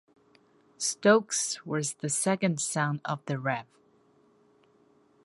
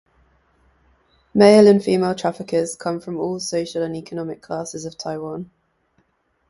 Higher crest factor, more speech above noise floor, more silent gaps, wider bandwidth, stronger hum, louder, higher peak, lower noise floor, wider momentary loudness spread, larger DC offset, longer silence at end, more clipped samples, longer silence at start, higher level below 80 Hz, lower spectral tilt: about the same, 24 dB vs 20 dB; second, 36 dB vs 47 dB; neither; about the same, 11.5 kHz vs 11.5 kHz; neither; second, -28 LUFS vs -19 LUFS; second, -8 dBFS vs 0 dBFS; about the same, -64 dBFS vs -66 dBFS; second, 10 LU vs 18 LU; neither; first, 1.6 s vs 1.05 s; neither; second, 0.8 s vs 1.35 s; second, -78 dBFS vs -58 dBFS; second, -4 dB/octave vs -5.5 dB/octave